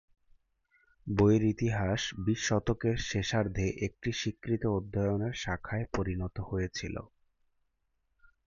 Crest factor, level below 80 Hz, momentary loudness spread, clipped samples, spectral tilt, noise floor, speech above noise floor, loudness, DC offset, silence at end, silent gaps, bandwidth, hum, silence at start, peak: 18 dB; -48 dBFS; 8 LU; under 0.1%; -5.5 dB/octave; -78 dBFS; 47 dB; -32 LUFS; under 0.1%; 1.4 s; none; 7.4 kHz; none; 1.05 s; -14 dBFS